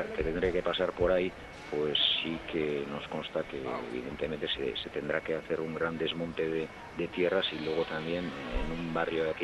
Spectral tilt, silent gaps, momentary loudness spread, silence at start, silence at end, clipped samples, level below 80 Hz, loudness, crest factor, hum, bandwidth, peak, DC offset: -5.5 dB/octave; none; 8 LU; 0 s; 0 s; under 0.1%; -48 dBFS; -32 LUFS; 18 dB; none; 12 kHz; -14 dBFS; under 0.1%